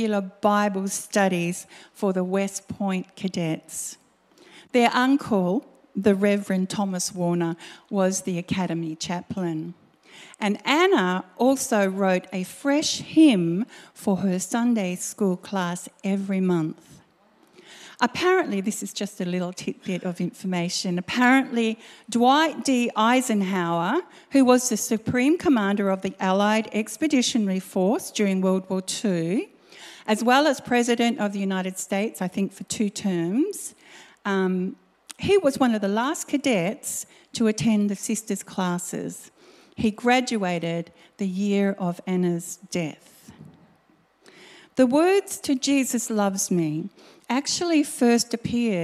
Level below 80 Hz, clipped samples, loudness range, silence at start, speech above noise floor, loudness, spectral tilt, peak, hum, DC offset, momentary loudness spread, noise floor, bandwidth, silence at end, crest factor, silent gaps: -64 dBFS; under 0.1%; 6 LU; 0 s; 38 dB; -24 LUFS; -4.5 dB/octave; -4 dBFS; none; under 0.1%; 10 LU; -61 dBFS; 15.5 kHz; 0 s; 20 dB; none